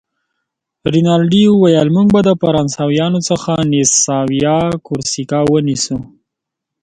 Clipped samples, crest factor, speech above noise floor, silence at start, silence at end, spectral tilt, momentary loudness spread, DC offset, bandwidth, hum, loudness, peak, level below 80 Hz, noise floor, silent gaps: under 0.1%; 14 dB; 67 dB; 0.85 s; 0.8 s; -5 dB/octave; 8 LU; under 0.1%; 9.6 kHz; none; -13 LUFS; 0 dBFS; -46 dBFS; -80 dBFS; none